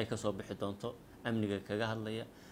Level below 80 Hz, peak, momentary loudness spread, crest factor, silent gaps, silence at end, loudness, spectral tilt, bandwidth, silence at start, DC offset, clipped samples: -66 dBFS; -20 dBFS; 8 LU; 18 dB; none; 0 s; -39 LUFS; -6 dB/octave; 16.5 kHz; 0 s; under 0.1%; under 0.1%